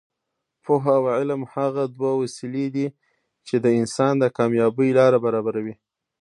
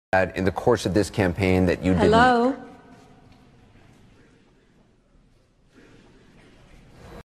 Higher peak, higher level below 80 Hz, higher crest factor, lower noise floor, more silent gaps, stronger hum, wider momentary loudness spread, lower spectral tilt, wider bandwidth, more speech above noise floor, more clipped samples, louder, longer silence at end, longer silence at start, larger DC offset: about the same, -4 dBFS vs -4 dBFS; second, -68 dBFS vs -46 dBFS; about the same, 18 dB vs 20 dB; first, -80 dBFS vs -59 dBFS; neither; neither; about the same, 10 LU vs 8 LU; about the same, -7 dB/octave vs -6 dB/octave; second, 11.5 kHz vs 13.5 kHz; first, 60 dB vs 39 dB; neither; about the same, -21 LUFS vs -21 LUFS; first, 0.5 s vs 0.05 s; first, 0.65 s vs 0.15 s; neither